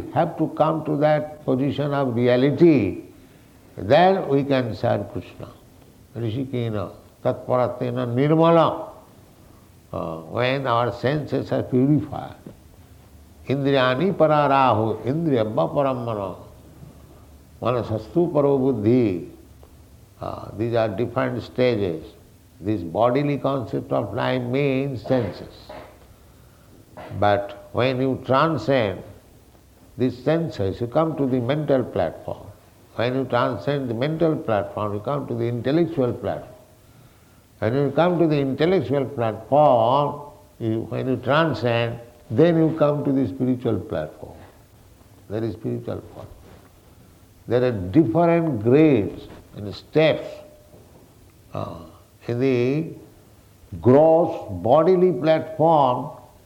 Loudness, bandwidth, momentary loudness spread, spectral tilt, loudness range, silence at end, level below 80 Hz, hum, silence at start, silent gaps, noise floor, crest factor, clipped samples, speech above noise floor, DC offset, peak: -21 LUFS; 16.5 kHz; 18 LU; -8.5 dB/octave; 6 LU; 0.25 s; -54 dBFS; none; 0 s; none; -52 dBFS; 18 dB; under 0.1%; 31 dB; under 0.1%; -4 dBFS